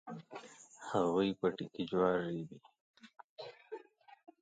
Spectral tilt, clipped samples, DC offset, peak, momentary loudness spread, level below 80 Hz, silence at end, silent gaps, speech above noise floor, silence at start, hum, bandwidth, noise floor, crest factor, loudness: -6.5 dB/octave; under 0.1%; under 0.1%; -20 dBFS; 19 LU; -72 dBFS; 0.25 s; 2.81-2.94 s, 3.24-3.37 s; 20 dB; 0.05 s; none; 9 kHz; -55 dBFS; 20 dB; -35 LUFS